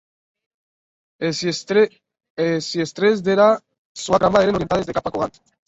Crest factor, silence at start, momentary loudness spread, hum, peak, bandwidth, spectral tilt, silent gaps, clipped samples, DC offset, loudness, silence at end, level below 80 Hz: 18 dB; 1.2 s; 11 LU; none; -2 dBFS; 8 kHz; -5 dB/octave; 2.30-2.37 s, 3.78-3.95 s; under 0.1%; under 0.1%; -19 LUFS; 0.4 s; -50 dBFS